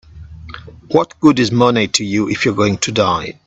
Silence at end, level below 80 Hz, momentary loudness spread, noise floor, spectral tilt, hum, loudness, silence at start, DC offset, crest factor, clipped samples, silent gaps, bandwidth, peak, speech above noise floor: 0.15 s; -46 dBFS; 21 LU; -34 dBFS; -4.5 dB/octave; none; -15 LUFS; 0.15 s; under 0.1%; 16 dB; under 0.1%; none; 8.2 kHz; 0 dBFS; 19 dB